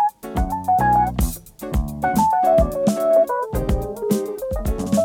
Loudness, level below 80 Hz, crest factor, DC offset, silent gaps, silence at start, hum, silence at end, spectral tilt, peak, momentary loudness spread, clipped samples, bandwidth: -20 LUFS; -28 dBFS; 16 dB; under 0.1%; none; 0 s; none; 0 s; -6.5 dB/octave; -4 dBFS; 9 LU; under 0.1%; 18 kHz